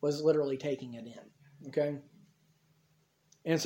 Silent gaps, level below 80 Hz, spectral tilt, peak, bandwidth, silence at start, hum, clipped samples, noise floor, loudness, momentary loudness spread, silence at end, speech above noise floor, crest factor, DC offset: none; -80 dBFS; -5.5 dB/octave; -16 dBFS; 16.5 kHz; 0 s; none; under 0.1%; -71 dBFS; -34 LUFS; 21 LU; 0 s; 39 dB; 20 dB; under 0.1%